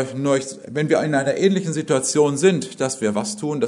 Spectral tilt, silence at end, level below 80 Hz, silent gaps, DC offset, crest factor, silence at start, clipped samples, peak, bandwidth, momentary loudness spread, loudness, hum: -5 dB/octave; 0 s; -68 dBFS; none; under 0.1%; 18 dB; 0 s; under 0.1%; -2 dBFS; 11 kHz; 8 LU; -20 LUFS; none